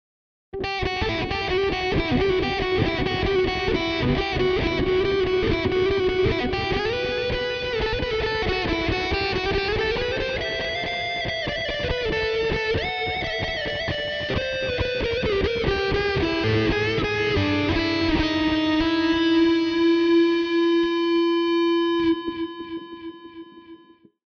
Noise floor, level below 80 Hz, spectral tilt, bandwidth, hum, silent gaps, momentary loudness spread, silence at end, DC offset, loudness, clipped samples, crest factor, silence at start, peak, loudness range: -52 dBFS; -36 dBFS; -6 dB/octave; 6.8 kHz; none; none; 5 LU; 0.5 s; under 0.1%; -23 LUFS; under 0.1%; 14 dB; 0.55 s; -8 dBFS; 4 LU